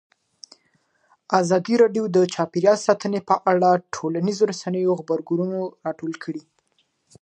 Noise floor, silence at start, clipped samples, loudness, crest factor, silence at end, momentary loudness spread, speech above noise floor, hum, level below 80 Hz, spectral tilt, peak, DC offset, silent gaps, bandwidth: -68 dBFS; 1.3 s; under 0.1%; -21 LUFS; 20 dB; 0.8 s; 12 LU; 47 dB; none; -72 dBFS; -6 dB/octave; -2 dBFS; under 0.1%; none; 9.4 kHz